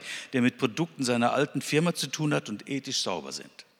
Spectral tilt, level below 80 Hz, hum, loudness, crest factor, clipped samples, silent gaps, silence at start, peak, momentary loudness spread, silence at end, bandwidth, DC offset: -4.5 dB/octave; -78 dBFS; none; -28 LUFS; 18 dB; under 0.1%; none; 0 s; -10 dBFS; 9 LU; 0.15 s; 16.5 kHz; under 0.1%